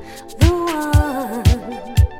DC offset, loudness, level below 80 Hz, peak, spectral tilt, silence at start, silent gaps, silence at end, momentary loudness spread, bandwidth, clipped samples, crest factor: under 0.1%; -18 LUFS; -22 dBFS; 0 dBFS; -6.5 dB/octave; 0 s; none; 0 s; 6 LU; 16.5 kHz; under 0.1%; 16 dB